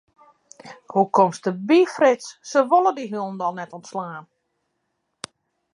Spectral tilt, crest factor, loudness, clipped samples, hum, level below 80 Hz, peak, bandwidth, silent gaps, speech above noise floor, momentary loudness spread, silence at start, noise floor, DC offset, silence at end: -5.5 dB/octave; 18 dB; -21 LUFS; under 0.1%; none; -78 dBFS; -4 dBFS; 11 kHz; none; 55 dB; 21 LU; 0.65 s; -75 dBFS; under 0.1%; 1.5 s